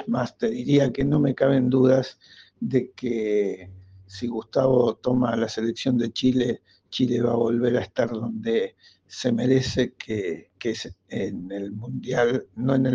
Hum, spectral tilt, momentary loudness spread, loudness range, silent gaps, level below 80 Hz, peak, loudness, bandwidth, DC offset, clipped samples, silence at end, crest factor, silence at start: none; -7 dB/octave; 12 LU; 4 LU; none; -56 dBFS; -8 dBFS; -24 LUFS; 7.6 kHz; under 0.1%; under 0.1%; 0 s; 16 dB; 0 s